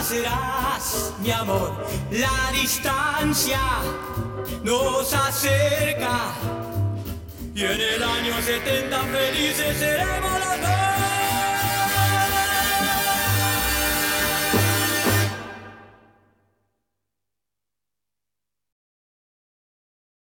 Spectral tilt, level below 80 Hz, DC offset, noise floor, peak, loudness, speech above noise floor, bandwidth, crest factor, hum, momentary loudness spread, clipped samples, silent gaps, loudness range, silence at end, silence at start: -3 dB/octave; -40 dBFS; under 0.1%; -87 dBFS; -6 dBFS; -22 LUFS; 64 dB; 18 kHz; 18 dB; 50 Hz at -45 dBFS; 8 LU; under 0.1%; none; 4 LU; 4.5 s; 0 s